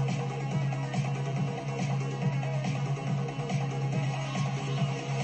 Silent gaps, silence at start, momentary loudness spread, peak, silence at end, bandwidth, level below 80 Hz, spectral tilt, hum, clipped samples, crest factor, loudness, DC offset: none; 0 s; 2 LU; -18 dBFS; 0 s; 8.6 kHz; -62 dBFS; -6.5 dB/octave; none; under 0.1%; 12 dB; -31 LUFS; under 0.1%